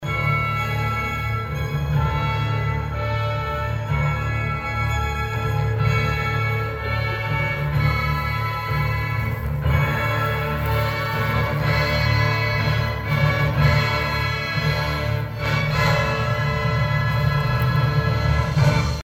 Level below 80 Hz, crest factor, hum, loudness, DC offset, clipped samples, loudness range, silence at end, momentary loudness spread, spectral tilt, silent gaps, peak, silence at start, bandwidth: -32 dBFS; 16 dB; none; -22 LUFS; under 0.1%; under 0.1%; 3 LU; 0 s; 5 LU; -6.5 dB/octave; none; -6 dBFS; 0 s; 17.5 kHz